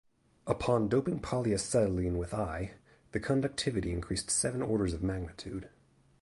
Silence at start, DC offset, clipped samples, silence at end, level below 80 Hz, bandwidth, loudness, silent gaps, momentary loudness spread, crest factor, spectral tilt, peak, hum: 0.45 s; under 0.1%; under 0.1%; 0.55 s; -48 dBFS; 11.5 kHz; -32 LUFS; none; 11 LU; 20 dB; -5 dB/octave; -12 dBFS; none